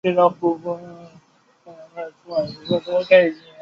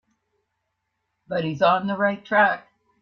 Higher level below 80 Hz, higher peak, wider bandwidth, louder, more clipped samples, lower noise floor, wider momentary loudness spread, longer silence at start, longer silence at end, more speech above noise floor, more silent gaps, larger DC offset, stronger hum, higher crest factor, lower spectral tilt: first, -64 dBFS vs -70 dBFS; first, -2 dBFS vs -6 dBFS; about the same, 6.6 kHz vs 6.6 kHz; about the same, -20 LUFS vs -22 LUFS; neither; second, -56 dBFS vs -77 dBFS; first, 20 LU vs 10 LU; second, 0.05 s vs 1.3 s; second, 0.25 s vs 0.45 s; second, 36 dB vs 56 dB; neither; neither; neither; about the same, 20 dB vs 18 dB; about the same, -7 dB/octave vs -7 dB/octave